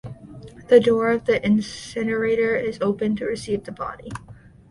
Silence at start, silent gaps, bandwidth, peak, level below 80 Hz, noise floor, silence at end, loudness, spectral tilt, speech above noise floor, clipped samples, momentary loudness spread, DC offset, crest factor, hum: 0.05 s; none; 11.5 kHz; -2 dBFS; -52 dBFS; -41 dBFS; 0.35 s; -21 LUFS; -6 dB/octave; 20 dB; under 0.1%; 21 LU; under 0.1%; 20 dB; none